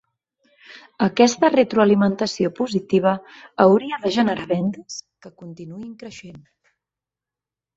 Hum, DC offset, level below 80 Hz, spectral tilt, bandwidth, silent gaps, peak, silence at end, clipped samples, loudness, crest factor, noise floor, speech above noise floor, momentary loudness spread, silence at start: none; under 0.1%; -62 dBFS; -5.5 dB/octave; 7.8 kHz; none; -2 dBFS; 1.4 s; under 0.1%; -19 LUFS; 20 dB; -89 dBFS; 69 dB; 21 LU; 0.7 s